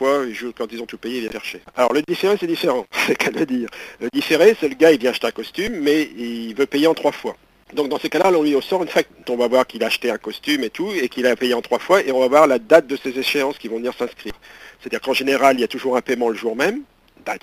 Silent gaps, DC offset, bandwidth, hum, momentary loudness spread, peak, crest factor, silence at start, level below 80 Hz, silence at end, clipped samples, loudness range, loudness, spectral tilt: none; under 0.1%; 15.5 kHz; none; 14 LU; 0 dBFS; 20 dB; 0 s; -56 dBFS; 0.05 s; under 0.1%; 4 LU; -19 LUFS; -4 dB/octave